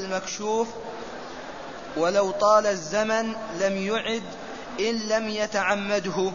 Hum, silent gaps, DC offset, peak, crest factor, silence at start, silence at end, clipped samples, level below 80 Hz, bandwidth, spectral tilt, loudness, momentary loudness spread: none; none; 0.4%; -8 dBFS; 18 dB; 0 s; 0 s; under 0.1%; -58 dBFS; 7.4 kHz; -3.5 dB/octave; -25 LUFS; 16 LU